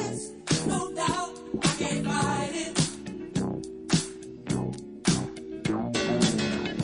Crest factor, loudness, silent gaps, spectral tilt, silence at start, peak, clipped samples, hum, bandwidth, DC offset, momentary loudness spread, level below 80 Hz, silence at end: 20 dB; -29 LUFS; none; -4.5 dB/octave; 0 s; -8 dBFS; under 0.1%; none; 11 kHz; under 0.1%; 10 LU; -54 dBFS; 0 s